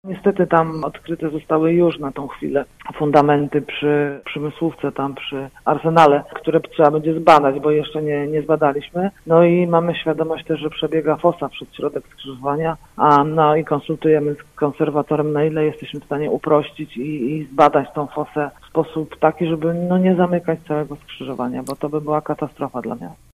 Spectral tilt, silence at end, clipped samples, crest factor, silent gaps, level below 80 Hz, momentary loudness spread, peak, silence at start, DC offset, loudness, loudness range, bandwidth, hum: -7.5 dB/octave; 0.2 s; under 0.1%; 18 dB; none; -52 dBFS; 12 LU; 0 dBFS; 0.05 s; under 0.1%; -19 LUFS; 4 LU; 14 kHz; none